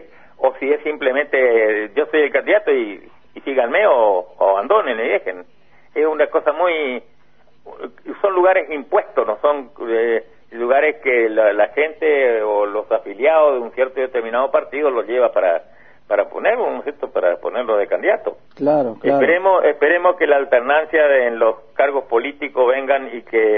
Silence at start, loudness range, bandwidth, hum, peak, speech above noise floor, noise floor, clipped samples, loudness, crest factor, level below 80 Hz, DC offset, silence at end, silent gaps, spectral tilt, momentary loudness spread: 0 s; 4 LU; 3.8 kHz; none; -2 dBFS; 40 dB; -57 dBFS; under 0.1%; -17 LUFS; 16 dB; -62 dBFS; 0.5%; 0 s; none; -7.5 dB/octave; 8 LU